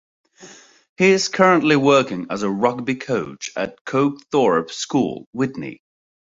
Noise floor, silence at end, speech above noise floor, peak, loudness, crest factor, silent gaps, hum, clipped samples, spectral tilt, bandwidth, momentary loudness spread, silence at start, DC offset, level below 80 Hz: -45 dBFS; 0.6 s; 26 dB; -2 dBFS; -19 LUFS; 18 dB; 0.89-0.96 s, 3.81-3.85 s, 5.26-5.33 s; none; under 0.1%; -5 dB/octave; 7.8 kHz; 12 LU; 0.4 s; under 0.1%; -60 dBFS